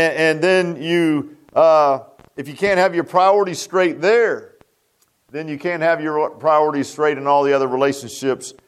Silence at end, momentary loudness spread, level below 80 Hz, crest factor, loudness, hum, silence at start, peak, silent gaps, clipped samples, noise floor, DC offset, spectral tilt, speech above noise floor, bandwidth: 0.15 s; 10 LU; -64 dBFS; 16 dB; -17 LUFS; none; 0 s; -2 dBFS; none; under 0.1%; -63 dBFS; under 0.1%; -5 dB/octave; 46 dB; 14 kHz